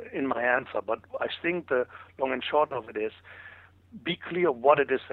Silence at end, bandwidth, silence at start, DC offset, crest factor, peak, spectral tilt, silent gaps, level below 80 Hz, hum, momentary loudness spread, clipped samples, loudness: 0 s; 4.6 kHz; 0 s; under 0.1%; 22 dB; -6 dBFS; -8 dB/octave; none; -68 dBFS; none; 14 LU; under 0.1%; -28 LUFS